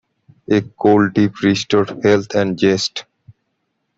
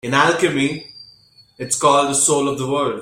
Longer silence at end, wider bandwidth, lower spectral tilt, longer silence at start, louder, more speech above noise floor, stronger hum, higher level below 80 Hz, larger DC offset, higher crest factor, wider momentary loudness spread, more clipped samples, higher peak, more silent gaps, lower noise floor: first, 0.95 s vs 0 s; second, 7.8 kHz vs 16 kHz; first, -5.5 dB/octave vs -3 dB/octave; first, 0.5 s vs 0.05 s; about the same, -16 LUFS vs -17 LUFS; first, 55 dB vs 33 dB; neither; about the same, -54 dBFS vs -56 dBFS; neither; about the same, 16 dB vs 16 dB; second, 6 LU vs 15 LU; neither; about the same, -2 dBFS vs -2 dBFS; neither; first, -71 dBFS vs -51 dBFS